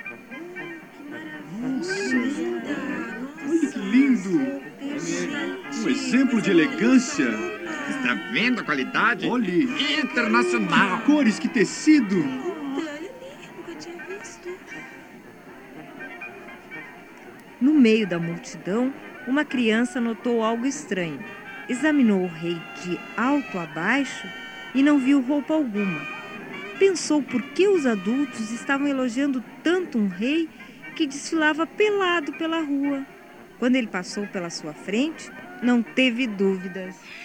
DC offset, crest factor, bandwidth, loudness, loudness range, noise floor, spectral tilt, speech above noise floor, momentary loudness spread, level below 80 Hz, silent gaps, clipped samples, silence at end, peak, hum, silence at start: under 0.1%; 18 dB; 10.5 kHz; -23 LUFS; 7 LU; -44 dBFS; -4.5 dB/octave; 22 dB; 18 LU; -66 dBFS; none; under 0.1%; 0 s; -6 dBFS; none; 0 s